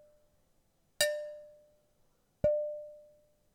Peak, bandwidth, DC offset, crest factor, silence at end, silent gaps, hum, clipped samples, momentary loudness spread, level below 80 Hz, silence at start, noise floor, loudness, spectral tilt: -14 dBFS; 19 kHz; under 0.1%; 26 dB; 0.55 s; none; none; under 0.1%; 18 LU; -62 dBFS; 1 s; -72 dBFS; -33 LUFS; -2 dB/octave